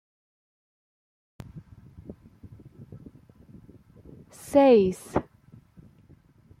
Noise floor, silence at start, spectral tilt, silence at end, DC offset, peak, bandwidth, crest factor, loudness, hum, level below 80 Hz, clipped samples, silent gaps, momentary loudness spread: -57 dBFS; 1.55 s; -6.5 dB/octave; 1.4 s; under 0.1%; -8 dBFS; 15 kHz; 22 dB; -22 LUFS; none; -58 dBFS; under 0.1%; none; 30 LU